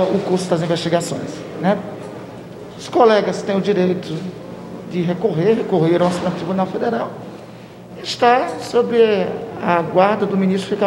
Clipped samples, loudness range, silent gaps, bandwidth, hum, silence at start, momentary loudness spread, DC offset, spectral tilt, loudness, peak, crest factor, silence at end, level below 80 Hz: under 0.1%; 2 LU; none; 12.5 kHz; none; 0 s; 18 LU; under 0.1%; -6 dB/octave; -18 LUFS; 0 dBFS; 18 dB; 0 s; -58 dBFS